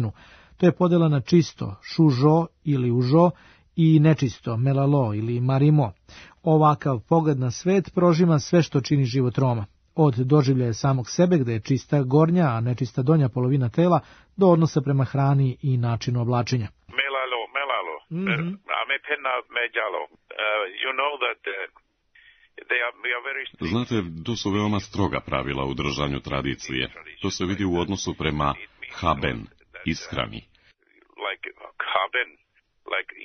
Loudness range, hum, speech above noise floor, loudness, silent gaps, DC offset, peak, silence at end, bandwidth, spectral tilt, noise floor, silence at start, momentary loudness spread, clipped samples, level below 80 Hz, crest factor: 7 LU; none; 38 dB; -23 LUFS; none; under 0.1%; -6 dBFS; 0 s; 6.6 kHz; -6.5 dB/octave; -60 dBFS; 0 s; 11 LU; under 0.1%; -50 dBFS; 18 dB